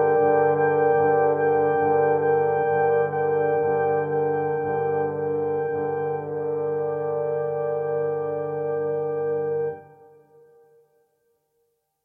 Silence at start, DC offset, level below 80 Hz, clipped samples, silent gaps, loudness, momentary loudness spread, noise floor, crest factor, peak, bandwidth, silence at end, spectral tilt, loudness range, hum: 0 s; under 0.1%; -68 dBFS; under 0.1%; none; -23 LUFS; 7 LU; -72 dBFS; 16 dB; -8 dBFS; 3.3 kHz; 2.2 s; -10.5 dB/octave; 8 LU; none